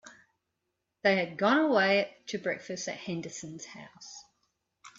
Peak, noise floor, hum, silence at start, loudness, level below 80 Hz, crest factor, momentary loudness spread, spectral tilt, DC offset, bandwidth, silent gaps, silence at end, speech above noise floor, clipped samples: -12 dBFS; -83 dBFS; none; 0.05 s; -29 LUFS; -76 dBFS; 20 dB; 22 LU; -4 dB/octave; under 0.1%; 7.8 kHz; none; 0.1 s; 53 dB; under 0.1%